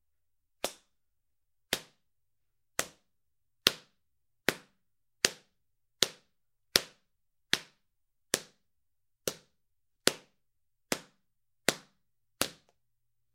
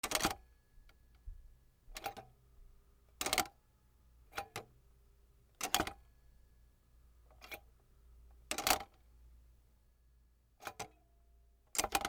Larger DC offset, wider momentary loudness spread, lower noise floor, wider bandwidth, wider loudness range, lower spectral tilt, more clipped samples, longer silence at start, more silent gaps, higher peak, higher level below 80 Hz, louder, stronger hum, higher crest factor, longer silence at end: neither; second, 16 LU vs 24 LU; first, -87 dBFS vs -69 dBFS; second, 16 kHz vs over 20 kHz; about the same, 5 LU vs 3 LU; about the same, -1 dB/octave vs -1 dB/octave; neither; first, 0.65 s vs 0.05 s; neither; first, 0 dBFS vs -12 dBFS; second, -72 dBFS vs -60 dBFS; first, -33 LUFS vs -39 LUFS; neither; first, 38 dB vs 32 dB; first, 0.8 s vs 0 s